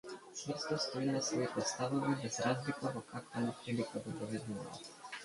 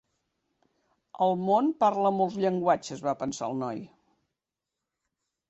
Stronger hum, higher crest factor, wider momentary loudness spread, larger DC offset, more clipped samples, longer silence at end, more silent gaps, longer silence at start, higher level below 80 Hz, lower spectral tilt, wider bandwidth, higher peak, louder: neither; about the same, 18 dB vs 20 dB; about the same, 10 LU vs 8 LU; neither; neither; second, 0 s vs 1.65 s; neither; second, 0.05 s vs 1.15 s; about the same, -74 dBFS vs -72 dBFS; second, -4.5 dB/octave vs -6 dB/octave; first, 11.5 kHz vs 8.2 kHz; second, -22 dBFS vs -10 dBFS; second, -39 LUFS vs -27 LUFS